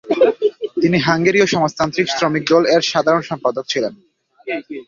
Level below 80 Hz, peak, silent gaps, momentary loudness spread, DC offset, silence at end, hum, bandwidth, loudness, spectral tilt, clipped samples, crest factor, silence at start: -56 dBFS; 0 dBFS; none; 11 LU; under 0.1%; 0.05 s; none; 7.6 kHz; -17 LUFS; -5 dB/octave; under 0.1%; 16 dB; 0.05 s